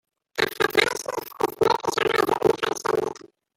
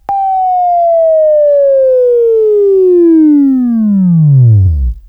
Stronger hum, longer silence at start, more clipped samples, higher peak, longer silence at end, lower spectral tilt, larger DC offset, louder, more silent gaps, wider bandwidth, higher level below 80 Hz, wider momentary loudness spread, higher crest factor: neither; first, 0.35 s vs 0.1 s; neither; second, -4 dBFS vs 0 dBFS; first, 0.4 s vs 0.1 s; second, -3 dB/octave vs -13.5 dB/octave; neither; second, -24 LUFS vs -8 LUFS; neither; first, 17 kHz vs 3.3 kHz; second, -60 dBFS vs -24 dBFS; first, 11 LU vs 4 LU; first, 22 dB vs 8 dB